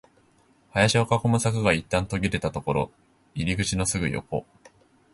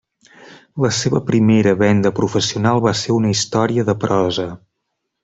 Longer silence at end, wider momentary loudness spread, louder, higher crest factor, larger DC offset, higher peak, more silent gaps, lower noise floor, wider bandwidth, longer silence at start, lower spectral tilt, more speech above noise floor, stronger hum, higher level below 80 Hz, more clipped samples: about the same, 0.7 s vs 0.65 s; first, 10 LU vs 7 LU; second, -25 LUFS vs -16 LUFS; first, 20 dB vs 14 dB; neither; second, -6 dBFS vs -2 dBFS; neither; second, -61 dBFS vs -75 dBFS; first, 11.5 kHz vs 8.2 kHz; first, 0.75 s vs 0.4 s; about the same, -5 dB/octave vs -5.5 dB/octave; second, 37 dB vs 59 dB; neither; first, -44 dBFS vs -52 dBFS; neither